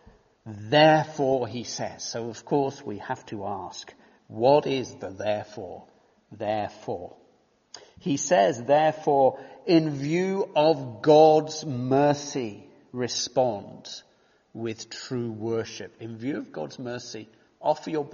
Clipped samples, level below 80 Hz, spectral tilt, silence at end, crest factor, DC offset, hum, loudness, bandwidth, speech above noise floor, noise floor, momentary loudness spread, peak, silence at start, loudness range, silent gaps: under 0.1%; -68 dBFS; -4.5 dB/octave; 0 s; 20 dB; under 0.1%; none; -25 LUFS; 7.2 kHz; 38 dB; -64 dBFS; 19 LU; -6 dBFS; 0.45 s; 12 LU; none